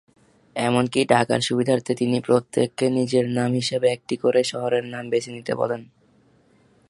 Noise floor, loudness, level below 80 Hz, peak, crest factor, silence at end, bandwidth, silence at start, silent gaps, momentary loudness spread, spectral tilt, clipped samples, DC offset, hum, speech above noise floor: -58 dBFS; -22 LUFS; -64 dBFS; 0 dBFS; 22 dB; 1.05 s; 11.5 kHz; 0.55 s; none; 7 LU; -5.5 dB/octave; under 0.1%; under 0.1%; none; 37 dB